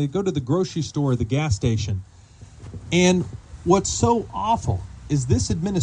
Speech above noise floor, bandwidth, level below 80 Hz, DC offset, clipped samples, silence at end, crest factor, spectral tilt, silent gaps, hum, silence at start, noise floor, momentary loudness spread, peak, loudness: 24 dB; 10 kHz; -40 dBFS; under 0.1%; under 0.1%; 0 s; 18 dB; -5.5 dB/octave; none; none; 0 s; -45 dBFS; 11 LU; -4 dBFS; -22 LUFS